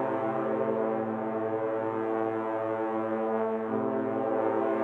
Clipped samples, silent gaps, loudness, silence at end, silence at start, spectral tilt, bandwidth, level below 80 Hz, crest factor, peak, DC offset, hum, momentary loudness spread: under 0.1%; none; -30 LUFS; 0 s; 0 s; -9 dB/octave; 4.2 kHz; under -90 dBFS; 14 dB; -16 dBFS; under 0.1%; none; 3 LU